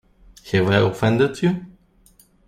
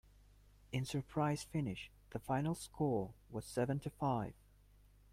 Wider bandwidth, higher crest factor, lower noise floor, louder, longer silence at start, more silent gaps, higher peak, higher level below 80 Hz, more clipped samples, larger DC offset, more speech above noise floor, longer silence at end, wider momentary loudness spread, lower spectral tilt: about the same, 15 kHz vs 16 kHz; about the same, 20 dB vs 18 dB; second, -55 dBFS vs -66 dBFS; first, -20 LUFS vs -41 LUFS; second, 0.45 s vs 0.7 s; neither; first, -2 dBFS vs -22 dBFS; first, -50 dBFS vs -62 dBFS; neither; neither; first, 37 dB vs 26 dB; about the same, 0.8 s vs 0.8 s; second, 6 LU vs 11 LU; about the same, -7 dB/octave vs -6.5 dB/octave